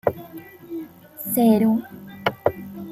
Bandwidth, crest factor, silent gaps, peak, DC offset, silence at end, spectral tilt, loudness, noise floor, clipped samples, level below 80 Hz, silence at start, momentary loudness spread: 16 kHz; 20 dB; none; -4 dBFS; under 0.1%; 0 s; -6 dB/octave; -21 LUFS; -41 dBFS; under 0.1%; -60 dBFS; 0.05 s; 23 LU